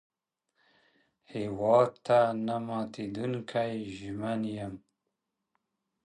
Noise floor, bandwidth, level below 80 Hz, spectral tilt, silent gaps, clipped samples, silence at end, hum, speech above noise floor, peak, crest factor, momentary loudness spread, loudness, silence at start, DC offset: -84 dBFS; 10.5 kHz; -68 dBFS; -7 dB/octave; none; under 0.1%; 1.3 s; none; 55 dB; -12 dBFS; 20 dB; 14 LU; -30 LUFS; 1.3 s; under 0.1%